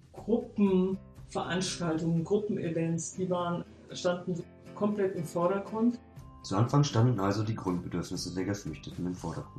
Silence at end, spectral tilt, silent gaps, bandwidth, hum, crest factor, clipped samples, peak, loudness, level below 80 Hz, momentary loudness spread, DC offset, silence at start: 0 s; -6 dB/octave; none; 13 kHz; none; 16 dB; under 0.1%; -14 dBFS; -31 LUFS; -58 dBFS; 11 LU; under 0.1%; 0.15 s